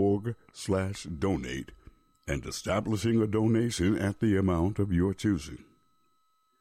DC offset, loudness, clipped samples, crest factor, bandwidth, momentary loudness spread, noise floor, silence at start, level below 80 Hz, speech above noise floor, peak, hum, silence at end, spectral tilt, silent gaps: under 0.1%; -29 LUFS; under 0.1%; 12 dB; 15.5 kHz; 13 LU; -72 dBFS; 0 s; -48 dBFS; 44 dB; -16 dBFS; none; 1.05 s; -6.5 dB/octave; none